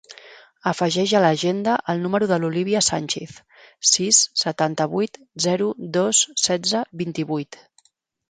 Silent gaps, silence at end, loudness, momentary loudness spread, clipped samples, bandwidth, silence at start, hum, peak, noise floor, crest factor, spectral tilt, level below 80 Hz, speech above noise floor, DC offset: none; 0.75 s; -20 LUFS; 11 LU; under 0.1%; 10 kHz; 0.1 s; none; -2 dBFS; -62 dBFS; 20 dB; -3 dB/octave; -64 dBFS; 40 dB; under 0.1%